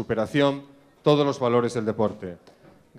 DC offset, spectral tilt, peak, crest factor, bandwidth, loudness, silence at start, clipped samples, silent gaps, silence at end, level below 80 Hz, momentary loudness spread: under 0.1%; -6.5 dB/octave; -6 dBFS; 18 dB; 12 kHz; -23 LUFS; 0 s; under 0.1%; none; 0.65 s; -60 dBFS; 14 LU